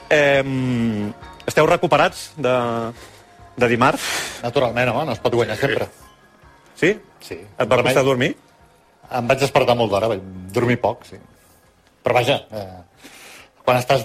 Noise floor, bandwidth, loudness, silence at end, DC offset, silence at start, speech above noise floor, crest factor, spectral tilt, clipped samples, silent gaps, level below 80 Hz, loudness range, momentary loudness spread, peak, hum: -55 dBFS; 16 kHz; -19 LUFS; 0 s; under 0.1%; 0 s; 36 dB; 18 dB; -5 dB/octave; under 0.1%; none; -50 dBFS; 3 LU; 15 LU; -2 dBFS; none